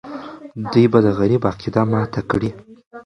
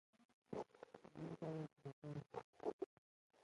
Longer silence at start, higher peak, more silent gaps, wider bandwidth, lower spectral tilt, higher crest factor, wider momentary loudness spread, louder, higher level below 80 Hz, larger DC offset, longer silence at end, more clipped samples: second, 0.05 s vs 0.2 s; first, 0 dBFS vs -32 dBFS; second, 2.86-2.91 s vs 0.25-0.42 s, 1.93-2.02 s, 2.44-2.53 s, 2.73-2.79 s, 2.86-3.30 s; second, 9.4 kHz vs 11 kHz; about the same, -8.5 dB/octave vs -8 dB/octave; about the same, 18 dB vs 20 dB; first, 17 LU vs 8 LU; first, -18 LUFS vs -53 LUFS; first, -46 dBFS vs -82 dBFS; neither; about the same, 0.05 s vs 0 s; neither